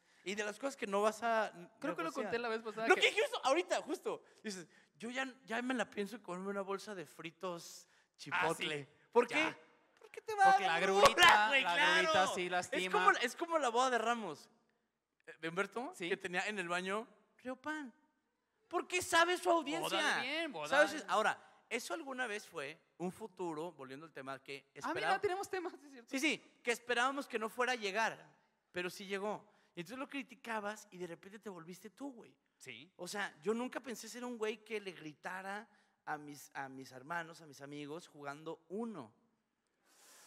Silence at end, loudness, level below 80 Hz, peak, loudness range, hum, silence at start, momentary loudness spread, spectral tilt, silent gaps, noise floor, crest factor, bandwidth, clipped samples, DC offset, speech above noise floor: 1.2 s; -36 LUFS; -76 dBFS; -10 dBFS; 16 LU; none; 0.25 s; 19 LU; -2.5 dB/octave; none; -84 dBFS; 28 dB; 16 kHz; under 0.1%; under 0.1%; 47 dB